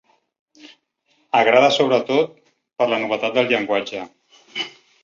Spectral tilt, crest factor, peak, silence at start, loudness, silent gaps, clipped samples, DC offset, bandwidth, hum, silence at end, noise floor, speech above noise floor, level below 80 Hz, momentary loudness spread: -4 dB/octave; 20 dB; -2 dBFS; 0.65 s; -19 LUFS; none; under 0.1%; under 0.1%; 7.4 kHz; none; 0.35 s; -65 dBFS; 47 dB; -68 dBFS; 16 LU